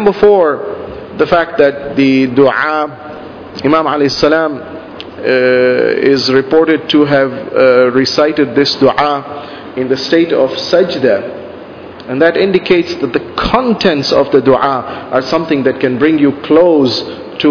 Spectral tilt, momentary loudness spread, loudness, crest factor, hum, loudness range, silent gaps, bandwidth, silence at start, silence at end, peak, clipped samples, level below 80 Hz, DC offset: -5.5 dB/octave; 16 LU; -11 LUFS; 12 dB; none; 3 LU; none; 5.4 kHz; 0 s; 0 s; 0 dBFS; 0.4%; -42 dBFS; under 0.1%